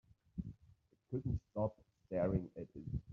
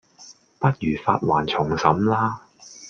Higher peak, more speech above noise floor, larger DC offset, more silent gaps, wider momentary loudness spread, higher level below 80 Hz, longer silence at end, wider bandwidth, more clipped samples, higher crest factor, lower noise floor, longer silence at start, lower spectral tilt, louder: second, -24 dBFS vs -2 dBFS; about the same, 29 dB vs 28 dB; neither; neither; first, 13 LU vs 5 LU; about the same, -56 dBFS vs -52 dBFS; about the same, 0 s vs 0 s; second, 6.4 kHz vs 7.6 kHz; neither; about the same, 18 dB vs 22 dB; first, -69 dBFS vs -49 dBFS; first, 0.35 s vs 0.2 s; first, -11 dB/octave vs -6.5 dB/octave; second, -42 LUFS vs -22 LUFS